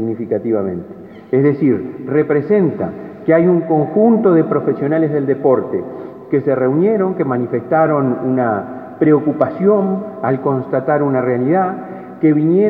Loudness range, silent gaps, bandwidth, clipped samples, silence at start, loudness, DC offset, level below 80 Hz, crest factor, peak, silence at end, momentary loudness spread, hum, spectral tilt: 2 LU; none; 4.1 kHz; under 0.1%; 0 s; -15 LUFS; under 0.1%; -60 dBFS; 14 dB; 0 dBFS; 0 s; 10 LU; none; -12 dB/octave